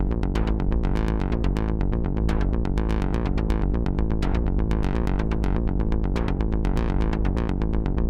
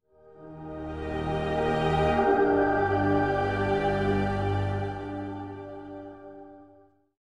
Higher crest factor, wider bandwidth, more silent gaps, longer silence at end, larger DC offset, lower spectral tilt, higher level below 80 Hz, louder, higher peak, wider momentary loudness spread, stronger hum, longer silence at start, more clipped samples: about the same, 14 dB vs 16 dB; second, 7.4 kHz vs 10.5 kHz; neither; second, 0 s vs 0.55 s; second, under 0.1% vs 0.1%; about the same, -8.5 dB/octave vs -8 dB/octave; first, -24 dBFS vs -46 dBFS; about the same, -25 LUFS vs -27 LUFS; first, -8 dBFS vs -12 dBFS; second, 1 LU vs 19 LU; neither; second, 0 s vs 0.25 s; neither